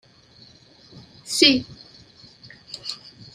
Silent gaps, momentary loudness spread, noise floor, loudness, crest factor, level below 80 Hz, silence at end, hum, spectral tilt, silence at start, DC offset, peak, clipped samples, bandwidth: none; 24 LU; -52 dBFS; -20 LUFS; 26 dB; -60 dBFS; 0.4 s; none; -2 dB/octave; 0.95 s; under 0.1%; 0 dBFS; under 0.1%; 14 kHz